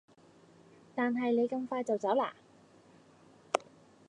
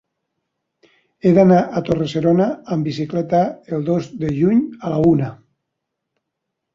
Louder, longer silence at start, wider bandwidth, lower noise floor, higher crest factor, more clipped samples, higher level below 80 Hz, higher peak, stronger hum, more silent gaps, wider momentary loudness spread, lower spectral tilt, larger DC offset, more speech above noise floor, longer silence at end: second, -33 LUFS vs -18 LUFS; second, 0.95 s vs 1.25 s; first, 10 kHz vs 7.6 kHz; second, -61 dBFS vs -78 dBFS; first, 28 dB vs 18 dB; neither; second, -84 dBFS vs -50 dBFS; second, -8 dBFS vs -2 dBFS; neither; neither; second, 6 LU vs 10 LU; second, -5 dB/octave vs -8.5 dB/octave; neither; second, 29 dB vs 62 dB; second, 0.45 s vs 1.4 s